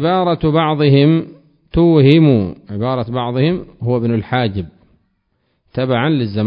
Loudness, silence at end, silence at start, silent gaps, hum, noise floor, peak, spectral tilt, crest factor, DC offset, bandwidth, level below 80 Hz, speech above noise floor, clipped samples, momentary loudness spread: -15 LUFS; 0 s; 0 s; none; none; -65 dBFS; 0 dBFS; -10.5 dB/octave; 14 dB; under 0.1%; 5.4 kHz; -38 dBFS; 51 dB; under 0.1%; 12 LU